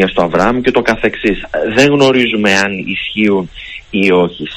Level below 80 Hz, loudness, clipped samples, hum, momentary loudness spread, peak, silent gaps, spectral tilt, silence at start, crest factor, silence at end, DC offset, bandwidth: -38 dBFS; -12 LUFS; 0.4%; none; 8 LU; 0 dBFS; none; -5 dB/octave; 0 s; 12 dB; 0 s; under 0.1%; 16 kHz